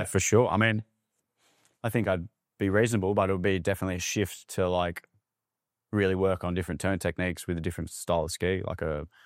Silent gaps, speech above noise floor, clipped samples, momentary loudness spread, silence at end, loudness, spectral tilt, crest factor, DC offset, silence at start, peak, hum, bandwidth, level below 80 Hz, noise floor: none; 60 dB; under 0.1%; 9 LU; 0.2 s; -28 LUFS; -5 dB/octave; 20 dB; under 0.1%; 0 s; -8 dBFS; none; 16 kHz; -52 dBFS; -88 dBFS